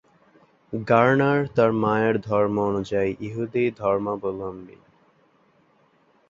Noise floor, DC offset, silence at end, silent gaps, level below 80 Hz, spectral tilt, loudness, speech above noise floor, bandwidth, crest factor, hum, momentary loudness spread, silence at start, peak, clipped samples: -61 dBFS; under 0.1%; 1.6 s; none; -56 dBFS; -8 dB/octave; -23 LUFS; 39 dB; 7.6 kHz; 22 dB; none; 14 LU; 0.7 s; -2 dBFS; under 0.1%